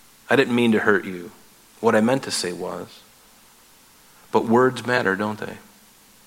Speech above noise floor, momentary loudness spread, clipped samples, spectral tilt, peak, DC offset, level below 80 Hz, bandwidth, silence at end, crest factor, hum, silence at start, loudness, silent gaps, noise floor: 31 dB; 17 LU; under 0.1%; -5 dB/octave; -2 dBFS; under 0.1%; -66 dBFS; 16.5 kHz; 0.65 s; 22 dB; none; 0.3 s; -21 LUFS; none; -52 dBFS